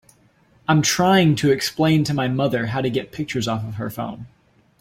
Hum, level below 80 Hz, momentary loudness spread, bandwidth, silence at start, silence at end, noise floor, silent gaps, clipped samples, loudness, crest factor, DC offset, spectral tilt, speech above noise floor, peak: none; -52 dBFS; 13 LU; 16.5 kHz; 0.7 s; 0.55 s; -57 dBFS; none; under 0.1%; -20 LUFS; 18 dB; under 0.1%; -5 dB/octave; 37 dB; -4 dBFS